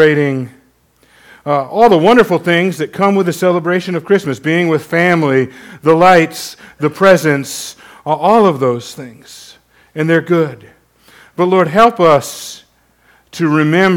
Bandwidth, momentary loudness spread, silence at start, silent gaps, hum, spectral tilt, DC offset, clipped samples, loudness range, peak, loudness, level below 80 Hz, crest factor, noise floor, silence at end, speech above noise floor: 18 kHz; 19 LU; 0 s; none; none; -6 dB/octave; under 0.1%; 0.4%; 3 LU; 0 dBFS; -12 LUFS; -52 dBFS; 12 dB; -53 dBFS; 0 s; 41 dB